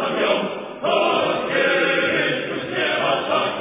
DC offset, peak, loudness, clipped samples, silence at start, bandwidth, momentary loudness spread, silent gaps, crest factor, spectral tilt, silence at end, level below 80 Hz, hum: under 0.1%; -6 dBFS; -20 LUFS; under 0.1%; 0 s; 3.9 kHz; 6 LU; none; 16 dB; -8 dB/octave; 0 s; -60 dBFS; none